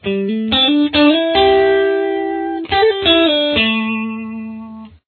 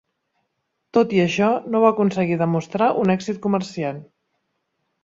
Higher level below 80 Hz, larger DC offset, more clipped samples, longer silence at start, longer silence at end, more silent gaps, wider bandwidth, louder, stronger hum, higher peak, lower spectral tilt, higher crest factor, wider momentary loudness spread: first, -42 dBFS vs -62 dBFS; neither; neither; second, 0.05 s vs 0.95 s; second, 0.2 s vs 1 s; neither; second, 4.5 kHz vs 7.8 kHz; first, -14 LUFS vs -20 LUFS; neither; first, 0 dBFS vs -4 dBFS; about the same, -7 dB/octave vs -7 dB/octave; about the same, 14 dB vs 18 dB; first, 15 LU vs 9 LU